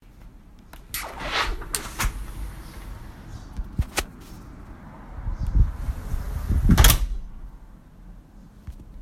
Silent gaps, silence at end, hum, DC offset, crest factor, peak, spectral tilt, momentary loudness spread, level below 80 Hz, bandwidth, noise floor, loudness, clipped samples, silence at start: none; 0 s; none; under 0.1%; 26 dB; 0 dBFS; -4 dB/octave; 24 LU; -28 dBFS; 16 kHz; -46 dBFS; -25 LUFS; under 0.1%; 0.05 s